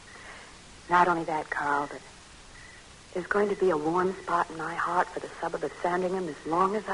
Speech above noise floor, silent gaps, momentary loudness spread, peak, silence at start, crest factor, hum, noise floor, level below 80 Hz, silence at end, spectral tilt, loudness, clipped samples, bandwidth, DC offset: 22 dB; none; 22 LU; -8 dBFS; 0 s; 20 dB; none; -49 dBFS; -58 dBFS; 0 s; -5.5 dB/octave; -28 LUFS; under 0.1%; 11 kHz; under 0.1%